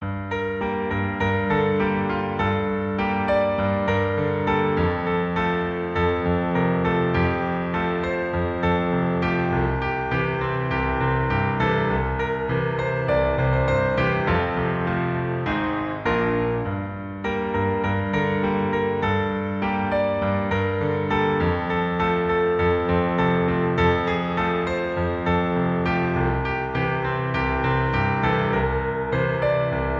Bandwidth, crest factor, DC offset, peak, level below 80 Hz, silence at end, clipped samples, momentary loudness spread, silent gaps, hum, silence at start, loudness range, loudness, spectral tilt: 7.4 kHz; 16 dB; under 0.1%; -8 dBFS; -38 dBFS; 0 s; under 0.1%; 4 LU; none; none; 0 s; 2 LU; -23 LUFS; -8.5 dB/octave